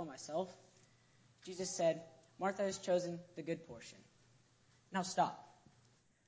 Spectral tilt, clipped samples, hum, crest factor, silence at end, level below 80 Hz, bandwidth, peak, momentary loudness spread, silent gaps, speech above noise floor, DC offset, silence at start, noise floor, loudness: -4.5 dB/octave; under 0.1%; none; 22 dB; 0.75 s; -80 dBFS; 8 kHz; -20 dBFS; 18 LU; none; 32 dB; under 0.1%; 0 s; -71 dBFS; -40 LUFS